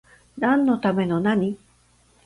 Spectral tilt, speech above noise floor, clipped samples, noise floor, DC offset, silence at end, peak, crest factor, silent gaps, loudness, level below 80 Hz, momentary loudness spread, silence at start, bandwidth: -8 dB/octave; 38 dB; under 0.1%; -59 dBFS; under 0.1%; 0.7 s; -8 dBFS; 16 dB; none; -22 LUFS; -58 dBFS; 8 LU; 0.35 s; 11 kHz